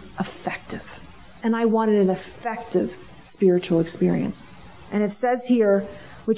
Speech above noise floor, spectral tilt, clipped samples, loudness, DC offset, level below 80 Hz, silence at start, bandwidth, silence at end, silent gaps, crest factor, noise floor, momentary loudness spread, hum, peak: 24 dB; -11.5 dB/octave; under 0.1%; -23 LUFS; 0.2%; -54 dBFS; 0 s; 4 kHz; 0 s; none; 16 dB; -45 dBFS; 16 LU; none; -8 dBFS